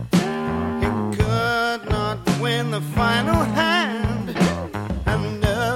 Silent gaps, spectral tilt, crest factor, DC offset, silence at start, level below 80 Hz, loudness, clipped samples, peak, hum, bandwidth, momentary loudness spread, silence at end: none; -5.5 dB/octave; 16 dB; under 0.1%; 0 s; -34 dBFS; -21 LUFS; under 0.1%; -4 dBFS; none; 16.5 kHz; 6 LU; 0 s